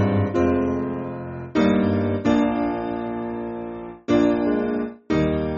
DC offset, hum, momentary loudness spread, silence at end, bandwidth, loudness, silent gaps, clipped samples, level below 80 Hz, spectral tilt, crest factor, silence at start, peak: under 0.1%; none; 11 LU; 0 s; 7.2 kHz; -23 LUFS; none; under 0.1%; -44 dBFS; -7 dB/octave; 16 dB; 0 s; -6 dBFS